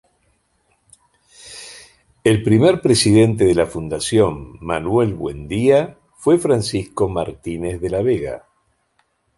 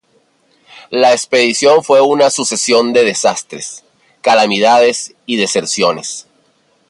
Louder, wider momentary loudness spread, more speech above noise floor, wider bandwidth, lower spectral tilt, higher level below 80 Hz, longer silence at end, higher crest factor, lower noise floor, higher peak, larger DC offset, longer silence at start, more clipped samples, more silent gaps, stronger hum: second, -17 LUFS vs -12 LUFS; first, 17 LU vs 13 LU; first, 48 dB vs 44 dB; about the same, 11.5 kHz vs 11.5 kHz; first, -5.5 dB/octave vs -2.5 dB/octave; first, -42 dBFS vs -64 dBFS; first, 1 s vs 0.7 s; about the same, 16 dB vs 14 dB; first, -65 dBFS vs -56 dBFS; about the same, -2 dBFS vs 0 dBFS; neither; first, 1.45 s vs 0.75 s; neither; neither; neither